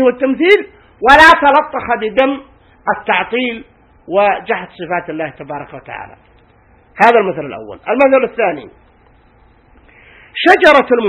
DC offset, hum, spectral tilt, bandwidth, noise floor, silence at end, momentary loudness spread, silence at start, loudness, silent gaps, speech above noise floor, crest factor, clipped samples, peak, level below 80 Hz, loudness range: under 0.1%; none; -4.5 dB/octave; 16 kHz; -48 dBFS; 0 s; 20 LU; 0 s; -12 LUFS; none; 36 dB; 14 dB; 0.6%; 0 dBFS; -44 dBFS; 8 LU